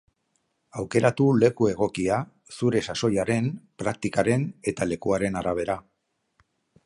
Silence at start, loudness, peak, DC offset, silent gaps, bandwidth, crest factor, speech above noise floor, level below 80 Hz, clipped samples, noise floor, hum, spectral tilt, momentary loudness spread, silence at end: 0.75 s; -25 LUFS; -4 dBFS; under 0.1%; none; 11.5 kHz; 20 dB; 51 dB; -54 dBFS; under 0.1%; -76 dBFS; none; -6 dB/octave; 10 LU; 1.05 s